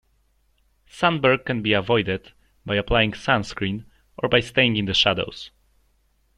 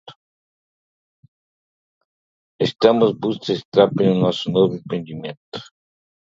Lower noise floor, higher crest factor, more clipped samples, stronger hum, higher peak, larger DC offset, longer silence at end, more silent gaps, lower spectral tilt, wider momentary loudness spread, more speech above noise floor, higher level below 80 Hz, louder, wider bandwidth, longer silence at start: second, -64 dBFS vs under -90 dBFS; about the same, 20 dB vs 22 dB; neither; neither; second, -4 dBFS vs 0 dBFS; neither; first, 0.9 s vs 0.6 s; second, none vs 0.16-2.59 s, 3.65-3.72 s, 5.37-5.52 s; second, -5 dB/octave vs -7 dB/octave; second, 13 LU vs 17 LU; second, 43 dB vs over 71 dB; first, -44 dBFS vs -62 dBFS; about the same, -21 LUFS vs -19 LUFS; first, 11.5 kHz vs 7.6 kHz; first, 0.95 s vs 0.05 s